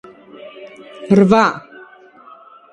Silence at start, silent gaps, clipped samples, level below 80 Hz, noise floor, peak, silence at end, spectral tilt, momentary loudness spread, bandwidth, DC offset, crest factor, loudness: 0.45 s; none; under 0.1%; -54 dBFS; -43 dBFS; 0 dBFS; 1.15 s; -7 dB/octave; 26 LU; 9 kHz; under 0.1%; 18 dB; -13 LUFS